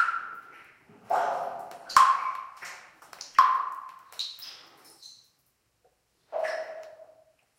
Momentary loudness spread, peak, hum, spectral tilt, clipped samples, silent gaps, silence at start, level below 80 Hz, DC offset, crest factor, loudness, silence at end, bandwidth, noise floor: 27 LU; -4 dBFS; none; 0 dB/octave; under 0.1%; none; 0 s; -74 dBFS; under 0.1%; 26 dB; -27 LUFS; 0.55 s; 16.5 kHz; -72 dBFS